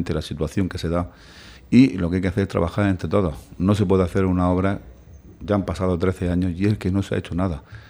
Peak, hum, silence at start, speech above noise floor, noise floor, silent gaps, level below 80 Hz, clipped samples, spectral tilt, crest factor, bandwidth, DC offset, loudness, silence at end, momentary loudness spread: -2 dBFS; none; 0 s; 23 dB; -44 dBFS; none; -40 dBFS; under 0.1%; -8 dB/octave; 20 dB; 12.5 kHz; under 0.1%; -22 LUFS; 0.1 s; 8 LU